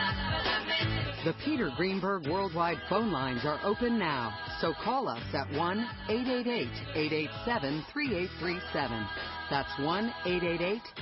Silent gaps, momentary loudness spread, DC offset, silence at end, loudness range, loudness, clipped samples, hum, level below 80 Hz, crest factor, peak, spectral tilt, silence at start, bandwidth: none; 4 LU; under 0.1%; 0 s; 2 LU; -32 LUFS; under 0.1%; none; -52 dBFS; 16 dB; -16 dBFS; -9.5 dB/octave; 0 s; 5.8 kHz